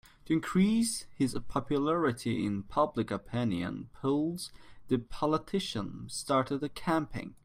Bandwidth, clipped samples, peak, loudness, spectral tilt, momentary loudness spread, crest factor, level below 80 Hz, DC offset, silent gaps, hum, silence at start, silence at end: 16 kHz; under 0.1%; -14 dBFS; -32 LUFS; -5.5 dB/octave; 9 LU; 18 dB; -56 dBFS; under 0.1%; none; none; 0.25 s; 0.1 s